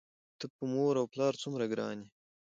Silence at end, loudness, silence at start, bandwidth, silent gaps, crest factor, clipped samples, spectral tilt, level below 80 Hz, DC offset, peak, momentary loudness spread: 0.45 s; -34 LUFS; 0.4 s; 8 kHz; 0.50-0.59 s; 16 dB; under 0.1%; -6 dB/octave; -82 dBFS; under 0.1%; -20 dBFS; 15 LU